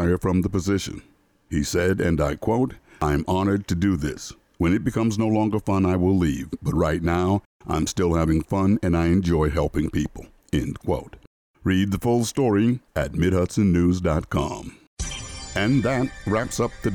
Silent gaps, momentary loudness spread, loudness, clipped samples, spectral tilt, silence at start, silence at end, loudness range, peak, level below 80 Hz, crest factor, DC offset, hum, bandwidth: 7.46-7.60 s, 11.27-11.54 s, 14.87-14.97 s; 9 LU; -23 LUFS; under 0.1%; -6.5 dB/octave; 0 s; 0 s; 2 LU; -10 dBFS; -38 dBFS; 12 dB; under 0.1%; none; 19 kHz